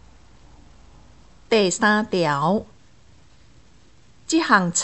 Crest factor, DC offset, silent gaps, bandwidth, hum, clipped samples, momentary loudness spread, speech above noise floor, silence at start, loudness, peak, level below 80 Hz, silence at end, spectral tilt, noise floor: 22 dB; 0.3%; none; 8.4 kHz; none; under 0.1%; 6 LU; 35 dB; 1.5 s; -20 LUFS; -2 dBFS; -54 dBFS; 0 s; -3.5 dB/octave; -54 dBFS